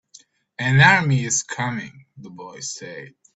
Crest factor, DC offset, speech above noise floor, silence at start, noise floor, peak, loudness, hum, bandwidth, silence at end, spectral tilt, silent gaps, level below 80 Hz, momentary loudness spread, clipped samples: 22 dB; under 0.1%; 31 dB; 0.6 s; -52 dBFS; 0 dBFS; -18 LUFS; none; 8.2 kHz; 0.25 s; -4 dB/octave; none; -54 dBFS; 25 LU; under 0.1%